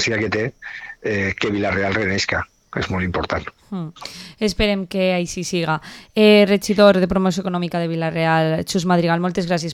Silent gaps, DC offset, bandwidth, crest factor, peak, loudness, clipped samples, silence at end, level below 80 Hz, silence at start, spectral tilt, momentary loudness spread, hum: none; under 0.1%; 15.5 kHz; 18 dB; 0 dBFS; -19 LUFS; under 0.1%; 0 s; -42 dBFS; 0 s; -5.5 dB/octave; 15 LU; none